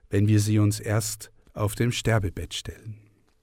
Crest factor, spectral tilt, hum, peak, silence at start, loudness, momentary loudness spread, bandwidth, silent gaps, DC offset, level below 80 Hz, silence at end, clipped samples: 16 dB; -5.5 dB/octave; none; -10 dBFS; 0.1 s; -25 LUFS; 18 LU; 16 kHz; none; under 0.1%; -46 dBFS; 0.45 s; under 0.1%